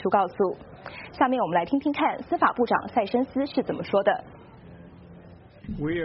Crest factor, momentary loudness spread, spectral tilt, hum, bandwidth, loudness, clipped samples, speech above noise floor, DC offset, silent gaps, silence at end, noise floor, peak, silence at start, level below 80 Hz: 20 dB; 16 LU; -4.5 dB/octave; none; 5.8 kHz; -25 LUFS; under 0.1%; 23 dB; under 0.1%; none; 0 s; -48 dBFS; -6 dBFS; 0 s; -54 dBFS